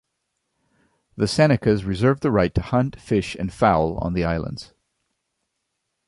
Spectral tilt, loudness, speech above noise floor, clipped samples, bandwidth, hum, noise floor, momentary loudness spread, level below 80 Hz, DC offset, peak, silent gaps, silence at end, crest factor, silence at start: -7 dB/octave; -21 LUFS; 57 dB; under 0.1%; 11.5 kHz; none; -77 dBFS; 9 LU; -40 dBFS; under 0.1%; -2 dBFS; none; 1.45 s; 20 dB; 1.15 s